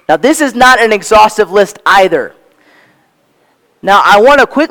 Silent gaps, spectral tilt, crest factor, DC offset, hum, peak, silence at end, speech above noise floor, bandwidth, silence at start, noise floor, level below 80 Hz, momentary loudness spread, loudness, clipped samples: none; -3 dB/octave; 8 dB; under 0.1%; none; 0 dBFS; 0.05 s; 46 dB; 19.5 kHz; 0.1 s; -53 dBFS; -40 dBFS; 7 LU; -7 LUFS; 3%